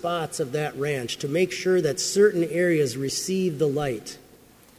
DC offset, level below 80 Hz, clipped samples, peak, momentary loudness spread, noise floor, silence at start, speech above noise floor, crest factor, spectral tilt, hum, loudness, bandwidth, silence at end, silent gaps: under 0.1%; -60 dBFS; under 0.1%; -6 dBFS; 8 LU; -53 dBFS; 0 s; 29 dB; 18 dB; -4.5 dB/octave; none; -24 LUFS; 16 kHz; 0.6 s; none